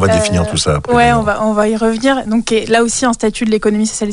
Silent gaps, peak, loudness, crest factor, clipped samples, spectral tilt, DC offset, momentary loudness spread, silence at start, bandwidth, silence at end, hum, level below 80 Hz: none; -2 dBFS; -13 LUFS; 12 dB; under 0.1%; -4.5 dB/octave; under 0.1%; 3 LU; 0 s; 11 kHz; 0 s; none; -32 dBFS